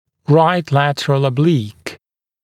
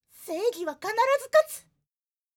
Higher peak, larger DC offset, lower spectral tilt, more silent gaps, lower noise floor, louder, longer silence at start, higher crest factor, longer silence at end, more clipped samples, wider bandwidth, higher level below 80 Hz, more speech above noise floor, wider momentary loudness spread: first, 0 dBFS vs -10 dBFS; neither; first, -7 dB/octave vs -1.5 dB/octave; neither; second, -46 dBFS vs under -90 dBFS; first, -15 LUFS vs -26 LUFS; about the same, 0.3 s vs 0.2 s; about the same, 16 dB vs 18 dB; second, 0.5 s vs 0.75 s; neither; second, 12.5 kHz vs 19.5 kHz; first, -62 dBFS vs -78 dBFS; second, 32 dB vs over 64 dB; first, 16 LU vs 13 LU